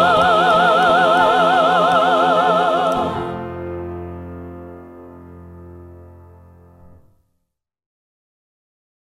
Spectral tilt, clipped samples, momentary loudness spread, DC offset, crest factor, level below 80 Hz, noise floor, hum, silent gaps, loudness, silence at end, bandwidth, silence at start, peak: -5 dB/octave; under 0.1%; 20 LU; under 0.1%; 16 dB; -50 dBFS; -75 dBFS; none; none; -15 LUFS; 3 s; 14 kHz; 0 s; -2 dBFS